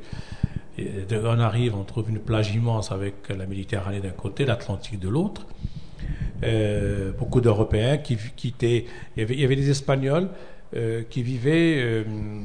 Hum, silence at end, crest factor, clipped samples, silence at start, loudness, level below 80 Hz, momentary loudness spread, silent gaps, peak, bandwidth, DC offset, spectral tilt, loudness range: none; 0 s; 18 dB; under 0.1%; 0 s; -25 LUFS; -40 dBFS; 12 LU; none; -6 dBFS; 10 kHz; 1%; -7 dB/octave; 4 LU